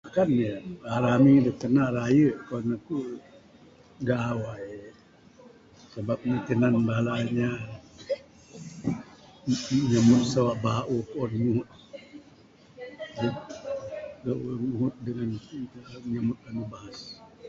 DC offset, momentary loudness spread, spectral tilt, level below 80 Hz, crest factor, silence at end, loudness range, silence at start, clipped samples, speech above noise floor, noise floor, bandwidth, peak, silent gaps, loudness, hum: under 0.1%; 20 LU; -7 dB/octave; -58 dBFS; 18 dB; 0 s; 9 LU; 0.05 s; under 0.1%; 29 dB; -55 dBFS; 7.8 kHz; -8 dBFS; none; -27 LUFS; none